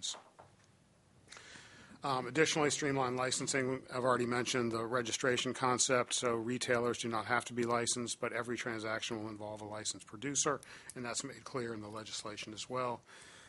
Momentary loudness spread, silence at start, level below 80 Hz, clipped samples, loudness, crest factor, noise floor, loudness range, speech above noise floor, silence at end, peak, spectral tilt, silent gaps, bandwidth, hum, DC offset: 13 LU; 0 s; -74 dBFS; under 0.1%; -36 LUFS; 22 dB; -67 dBFS; 6 LU; 31 dB; 0 s; -16 dBFS; -3 dB/octave; none; 11.5 kHz; none; under 0.1%